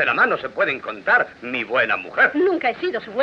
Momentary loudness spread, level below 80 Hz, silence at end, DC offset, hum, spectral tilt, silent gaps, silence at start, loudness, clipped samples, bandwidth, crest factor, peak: 8 LU; -64 dBFS; 0 s; under 0.1%; none; -5.5 dB/octave; none; 0 s; -20 LUFS; under 0.1%; 7 kHz; 14 dB; -6 dBFS